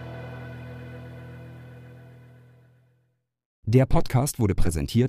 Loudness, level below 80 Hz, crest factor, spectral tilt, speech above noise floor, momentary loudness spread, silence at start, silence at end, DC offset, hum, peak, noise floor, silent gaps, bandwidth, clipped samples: -24 LUFS; -34 dBFS; 20 dB; -6.5 dB/octave; 51 dB; 24 LU; 0 s; 0 s; under 0.1%; none; -6 dBFS; -72 dBFS; 3.45-3.63 s; 15.5 kHz; under 0.1%